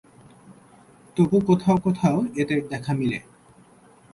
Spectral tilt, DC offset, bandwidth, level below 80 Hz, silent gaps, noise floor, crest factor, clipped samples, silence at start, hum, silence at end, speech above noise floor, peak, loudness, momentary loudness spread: -8 dB/octave; under 0.1%; 11.5 kHz; -56 dBFS; none; -53 dBFS; 16 dB; under 0.1%; 0.5 s; none; 0.95 s; 32 dB; -8 dBFS; -23 LUFS; 8 LU